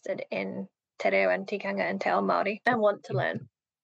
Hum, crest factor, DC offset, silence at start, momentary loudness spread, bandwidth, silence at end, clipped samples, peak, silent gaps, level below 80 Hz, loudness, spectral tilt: none; 16 dB; under 0.1%; 0.05 s; 10 LU; 8 kHz; 0.4 s; under 0.1%; -12 dBFS; none; -82 dBFS; -28 LUFS; -6.5 dB/octave